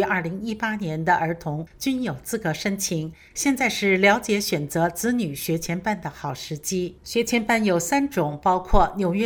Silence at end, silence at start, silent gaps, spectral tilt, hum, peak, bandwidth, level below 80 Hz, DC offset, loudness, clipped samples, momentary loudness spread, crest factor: 0 s; 0 s; none; -4.5 dB/octave; none; -2 dBFS; over 20 kHz; -38 dBFS; under 0.1%; -23 LUFS; under 0.1%; 9 LU; 20 dB